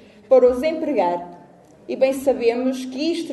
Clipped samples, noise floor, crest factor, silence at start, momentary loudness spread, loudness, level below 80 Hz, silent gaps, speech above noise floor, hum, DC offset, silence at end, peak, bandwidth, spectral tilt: under 0.1%; -47 dBFS; 16 dB; 0.3 s; 11 LU; -20 LUFS; -56 dBFS; none; 29 dB; none; under 0.1%; 0 s; -4 dBFS; 12 kHz; -4.5 dB/octave